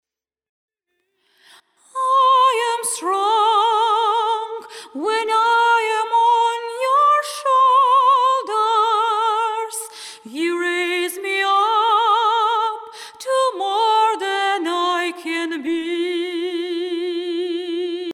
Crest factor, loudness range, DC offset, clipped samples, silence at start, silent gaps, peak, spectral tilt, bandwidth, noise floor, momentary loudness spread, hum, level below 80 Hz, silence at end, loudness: 14 dB; 5 LU; under 0.1%; under 0.1%; 1.95 s; none; -6 dBFS; 0 dB/octave; 15.5 kHz; -73 dBFS; 10 LU; none; -84 dBFS; 0 s; -18 LUFS